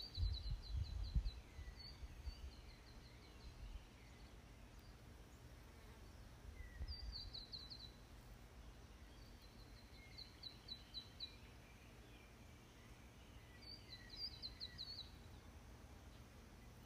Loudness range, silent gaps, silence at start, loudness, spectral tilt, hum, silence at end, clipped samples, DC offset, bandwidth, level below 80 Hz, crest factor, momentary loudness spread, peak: 8 LU; none; 0 s; -55 LUFS; -4.5 dB/octave; none; 0 s; under 0.1%; under 0.1%; 15.5 kHz; -56 dBFS; 24 dB; 13 LU; -28 dBFS